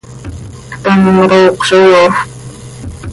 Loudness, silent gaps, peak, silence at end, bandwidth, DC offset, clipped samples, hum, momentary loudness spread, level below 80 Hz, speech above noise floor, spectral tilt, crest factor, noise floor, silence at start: -8 LUFS; none; 0 dBFS; 0 s; 11.5 kHz; under 0.1%; under 0.1%; none; 22 LU; -36 dBFS; 21 dB; -5.5 dB/octave; 10 dB; -28 dBFS; 0.1 s